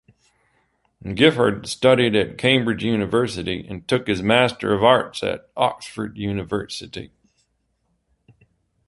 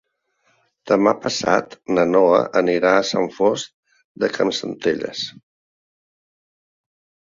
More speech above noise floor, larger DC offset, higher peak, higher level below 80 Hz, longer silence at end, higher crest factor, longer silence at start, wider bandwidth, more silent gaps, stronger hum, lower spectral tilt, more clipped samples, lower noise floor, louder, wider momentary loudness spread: about the same, 50 dB vs 48 dB; neither; about the same, -2 dBFS vs -2 dBFS; first, -50 dBFS vs -62 dBFS; second, 1.8 s vs 2 s; about the same, 20 dB vs 18 dB; first, 1.05 s vs 0.85 s; first, 11.5 kHz vs 7.8 kHz; second, none vs 3.74-3.83 s, 4.04-4.15 s; neither; about the same, -5.5 dB/octave vs -4.5 dB/octave; neither; first, -70 dBFS vs -66 dBFS; about the same, -20 LUFS vs -19 LUFS; first, 14 LU vs 11 LU